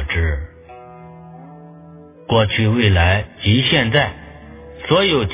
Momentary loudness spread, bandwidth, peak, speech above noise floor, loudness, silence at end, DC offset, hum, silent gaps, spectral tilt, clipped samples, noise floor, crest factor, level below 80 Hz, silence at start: 24 LU; 4 kHz; 0 dBFS; 26 dB; -16 LUFS; 0 s; under 0.1%; none; none; -10 dB/octave; under 0.1%; -41 dBFS; 18 dB; -30 dBFS; 0 s